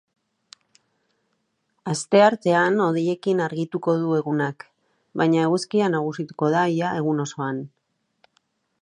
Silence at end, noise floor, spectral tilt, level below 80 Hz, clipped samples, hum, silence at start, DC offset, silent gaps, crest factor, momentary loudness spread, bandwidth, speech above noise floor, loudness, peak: 1.15 s; -72 dBFS; -6 dB/octave; -74 dBFS; under 0.1%; none; 1.85 s; under 0.1%; none; 20 dB; 12 LU; 11 kHz; 51 dB; -22 LUFS; -4 dBFS